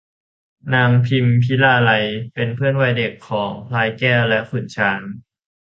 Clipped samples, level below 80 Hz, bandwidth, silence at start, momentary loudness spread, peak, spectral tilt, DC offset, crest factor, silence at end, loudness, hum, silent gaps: under 0.1%; -54 dBFS; 6.8 kHz; 0.65 s; 10 LU; -2 dBFS; -7.5 dB/octave; under 0.1%; 16 dB; 0.5 s; -17 LUFS; none; none